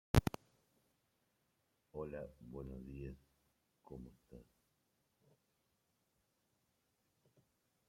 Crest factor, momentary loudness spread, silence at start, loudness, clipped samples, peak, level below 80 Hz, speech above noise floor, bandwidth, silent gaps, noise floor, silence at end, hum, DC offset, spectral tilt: 32 dB; 22 LU; 0.15 s; -45 LUFS; under 0.1%; -14 dBFS; -56 dBFS; 31 dB; 16 kHz; none; -82 dBFS; 3.45 s; none; under 0.1%; -6.5 dB/octave